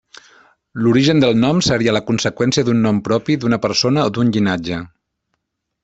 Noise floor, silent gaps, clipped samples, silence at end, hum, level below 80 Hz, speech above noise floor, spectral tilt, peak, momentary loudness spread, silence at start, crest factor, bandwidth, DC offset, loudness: -73 dBFS; none; under 0.1%; 0.95 s; none; -48 dBFS; 57 dB; -5.5 dB/octave; -2 dBFS; 6 LU; 0.75 s; 14 dB; 8.2 kHz; under 0.1%; -16 LUFS